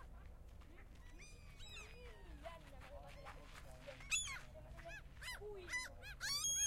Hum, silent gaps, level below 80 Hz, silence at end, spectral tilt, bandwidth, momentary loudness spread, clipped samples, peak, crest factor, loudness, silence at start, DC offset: none; none; -58 dBFS; 0 s; -0.5 dB/octave; 16 kHz; 20 LU; under 0.1%; -28 dBFS; 20 dB; -47 LUFS; 0 s; under 0.1%